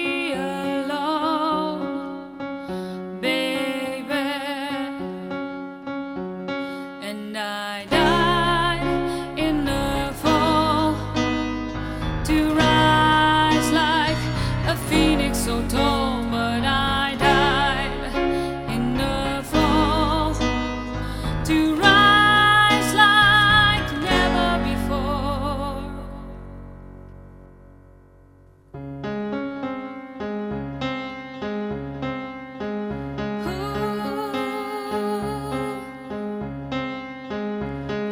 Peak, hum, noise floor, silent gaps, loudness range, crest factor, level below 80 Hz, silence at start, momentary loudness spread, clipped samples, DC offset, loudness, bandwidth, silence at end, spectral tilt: -2 dBFS; none; -51 dBFS; none; 14 LU; 22 dB; -36 dBFS; 0 s; 16 LU; under 0.1%; under 0.1%; -21 LUFS; 16.5 kHz; 0 s; -4.5 dB/octave